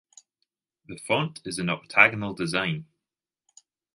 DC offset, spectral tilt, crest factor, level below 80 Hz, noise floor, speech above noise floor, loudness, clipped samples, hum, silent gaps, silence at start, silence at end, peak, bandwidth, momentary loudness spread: under 0.1%; -4.5 dB/octave; 28 dB; -62 dBFS; -89 dBFS; 64 dB; -24 LUFS; under 0.1%; none; none; 0.9 s; 1.1 s; -2 dBFS; 11.5 kHz; 17 LU